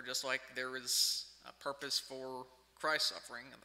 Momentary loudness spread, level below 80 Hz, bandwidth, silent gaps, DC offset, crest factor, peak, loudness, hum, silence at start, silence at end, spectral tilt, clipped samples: 16 LU; -78 dBFS; 16 kHz; none; under 0.1%; 22 dB; -18 dBFS; -36 LUFS; none; 0 s; 0.05 s; 0.5 dB/octave; under 0.1%